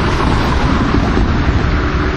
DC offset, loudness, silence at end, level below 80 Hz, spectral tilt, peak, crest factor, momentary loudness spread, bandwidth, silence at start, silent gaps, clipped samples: under 0.1%; -14 LUFS; 0 s; -18 dBFS; -6.5 dB/octave; -2 dBFS; 12 dB; 1 LU; 10.5 kHz; 0 s; none; under 0.1%